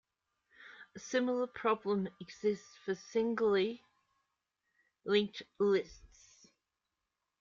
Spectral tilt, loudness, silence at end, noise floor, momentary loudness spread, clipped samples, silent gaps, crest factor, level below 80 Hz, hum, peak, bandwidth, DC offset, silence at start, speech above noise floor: -5 dB/octave; -35 LUFS; 1.35 s; -88 dBFS; 19 LU; under 0.1%; none; 20 dB; -72 dBFS; none; -16 dBFS; 7.4 kHz; under 0.1%; 0.6 s; 54 dB